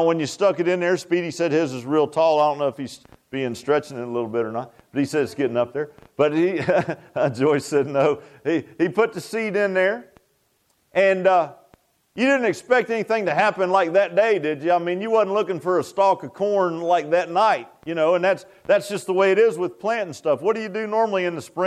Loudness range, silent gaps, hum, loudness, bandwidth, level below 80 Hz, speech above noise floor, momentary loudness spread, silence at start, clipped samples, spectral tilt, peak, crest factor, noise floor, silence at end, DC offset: 3 LU; none; none; -21 LUFS; 13.5 kHz; -68 dBFS; 45 dB; 8 LU; 0 s; under 0.1%; -5.5 dB/octave; -6 dBFS; 16 dB; -66 dBFS; 0 s; under 0.1%